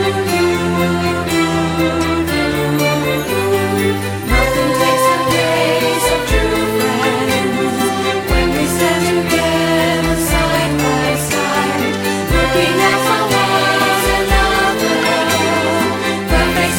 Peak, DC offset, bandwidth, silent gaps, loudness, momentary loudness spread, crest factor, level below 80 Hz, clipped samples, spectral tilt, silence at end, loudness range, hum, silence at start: 0 dBFS; under 0.1%; 17.5 kHz; none; -14 LUFS; 4 LU; 14 dB; -26 dBFS; under 0.1%; -4 dB/octave; 0 s; 2 LU; none; 0 s